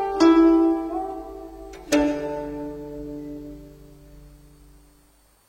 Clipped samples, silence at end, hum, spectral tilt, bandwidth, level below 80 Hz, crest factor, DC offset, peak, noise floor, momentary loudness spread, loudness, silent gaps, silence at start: under 0.1%; 1.2 s; none; -5 dB/octave; 10 kHz; -48 dBFS; 20 dB; under 0.1%; -4 dBFS; -58 dBFS; 24 LU; -21 LUFS; none; 0 s